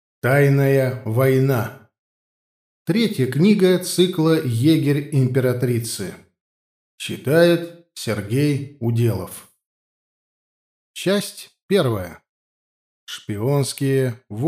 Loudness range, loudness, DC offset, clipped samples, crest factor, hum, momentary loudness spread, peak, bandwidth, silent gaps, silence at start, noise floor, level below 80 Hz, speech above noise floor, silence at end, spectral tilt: 7 LU; -19 LUFS; under 0.1%; under 0.1%; 18 dB; none; 16 LU; -2 dBFS; 15.5 kHz; 1.98-2.86 s, 6.41-6.98 s, 9.66-10.94 s, 11.62-11.69 s, 12.29-13.07 s; 0.25 s; under -90 dBFS; -64 dBFS; over 71 dB; 0 s; -6 dB/octave